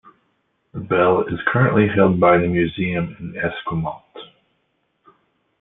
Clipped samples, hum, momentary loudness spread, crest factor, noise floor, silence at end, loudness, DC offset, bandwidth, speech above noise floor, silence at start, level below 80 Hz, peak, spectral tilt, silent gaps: under 0.1%; none; 20 LU; 18 dB; -69 dBFS; 1.35 s; -18 LUFS; under 0.1%; 4 kHz; 51 dB; 0.75 s; -50 dBFS; -2 dBFS; -11.5 dB/octave; none